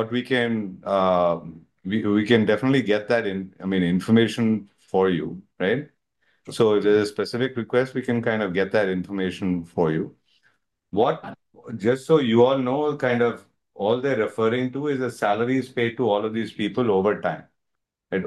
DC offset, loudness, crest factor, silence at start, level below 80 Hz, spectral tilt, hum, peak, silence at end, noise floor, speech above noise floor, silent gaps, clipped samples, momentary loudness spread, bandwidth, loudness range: under 0.1%; -23 LUFS; 18 dB; 0 s; -66 dBFS; -7 dB/octave; none; -4 dBFS; 0 s; -80 dBFS; 58 dB; none; under 0.1%; 10 LU; 12.5 kHz; 3 LU